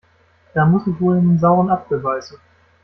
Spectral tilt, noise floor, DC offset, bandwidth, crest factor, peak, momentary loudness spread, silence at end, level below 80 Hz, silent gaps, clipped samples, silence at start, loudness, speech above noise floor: -9.5 dB/octave; -55 dBFS; under 0.1%; 6.2 kHz; 14 dB; -4 dBFS; 10 LU; 0.55 s; -52 dBFS; none; under 0.1%; 0.55 s; -17 LUFS; 39 dB